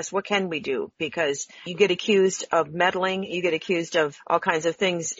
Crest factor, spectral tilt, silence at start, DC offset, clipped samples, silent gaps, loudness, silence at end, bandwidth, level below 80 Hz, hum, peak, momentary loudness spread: 20 dB; -2.5 dB/octave; 0 s; under 0.1%; under 0.1%; none; -24 LUFS; 0.05 s; 8 kHz; -68 dBFS; none; -6 dBFS; 7 LU